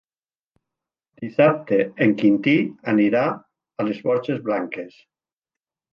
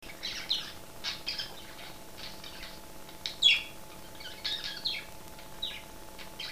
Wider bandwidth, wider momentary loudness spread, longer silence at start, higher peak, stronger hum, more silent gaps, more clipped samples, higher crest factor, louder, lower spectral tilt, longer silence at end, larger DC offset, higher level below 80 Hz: second, 6 kHz vs 15.5 kHz; second, 17 LU vs 22 LU; first, 1.2 s vs 0 s; first, -4 dBFS vs -12 dBFS; neither; neither; neither; second, 18 dB vs 26 dB; first, -21 LUFS vs -31 LUFS; first, -8.5 dB/octave vs -0.5 dB/octave; first, 1.05 s vs 0 s; second, under 0.1% vs 0.4%; second, -68 dBFS vs -58 dBFS